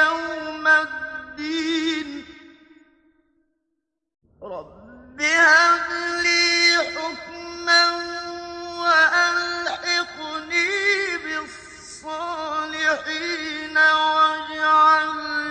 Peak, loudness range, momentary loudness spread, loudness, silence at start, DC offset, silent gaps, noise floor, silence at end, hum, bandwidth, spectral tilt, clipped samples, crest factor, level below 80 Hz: -4 dBFS; 11 LU; 18 LU; -19 LUFS; 0 s; under 0.1%; none; -78 dBFS; 0 s; none; 10 kHz; -0.5 dB/octave; under 0.1%; 18 dB; -60 dBFS